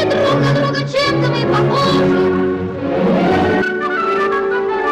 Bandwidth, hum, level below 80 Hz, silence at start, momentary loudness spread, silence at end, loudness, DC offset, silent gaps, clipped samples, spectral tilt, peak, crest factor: 11 kHz; none; -44 dBFS; 0 s; 4 LU; 0 s; -15 LUFS; under 0.1%; none; under 0.1%; -6.5 dB/octave; -4 dBFS; 10 dB